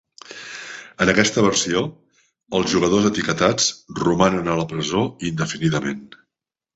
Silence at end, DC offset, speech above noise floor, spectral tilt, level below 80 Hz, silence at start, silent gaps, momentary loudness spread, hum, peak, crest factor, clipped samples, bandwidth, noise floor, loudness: 0.7 s; under 0.1%; 65 dB; -4 dB/octave; -50 dBFS; 0.3 s; none; 17 LU; none; -2 dBFS; 20 dB; under 0.1%; 8.2 kHz; -84 dBFS; -20 LUFS